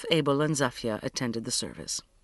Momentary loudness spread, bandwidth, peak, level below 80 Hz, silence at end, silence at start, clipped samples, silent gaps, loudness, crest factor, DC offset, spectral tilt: 8 LU; 11.5 kHz; -8 dBFS; -58 dBFS; 0.2 s; 0 s; under 0.1%; none; -29 LUFS; 22 dB; under 0.1%; -4 dB/octave